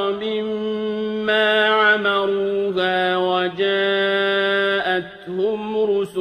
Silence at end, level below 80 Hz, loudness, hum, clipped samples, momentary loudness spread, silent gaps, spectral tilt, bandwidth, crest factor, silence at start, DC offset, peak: 0 s; -62 dBFS; -19 LUFS; none; under 0.1%; 8 LU; none; -5.5 dB/octave; 9.6 kHz; 16 dB; 0 s; under 0.1%; -4 dBFS